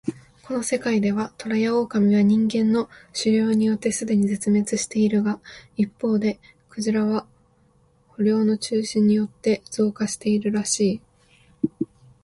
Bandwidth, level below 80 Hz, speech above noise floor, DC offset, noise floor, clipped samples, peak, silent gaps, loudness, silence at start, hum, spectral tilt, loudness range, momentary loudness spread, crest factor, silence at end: 11.5 kHz; -60 dBFS; 38 dB; under 0.1%; -60 dBFS; under 0.1%; -8 dBFS; none; -22 LUFS; 0.05 s; none; -5.5 dB/octave; 4 LU; 10 LU; 16 dB; 0.4 s